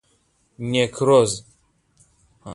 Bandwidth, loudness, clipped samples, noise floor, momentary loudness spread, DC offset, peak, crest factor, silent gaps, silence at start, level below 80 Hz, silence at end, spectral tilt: 11.5 kHz; -19 LUFS; under 0.1%; -64 dBFS; 15 LU; under 0.1%; -4 dBFS; 20 dB; none; 0.6 s; -58 dBFS; 0 s; -4.5 dB/octave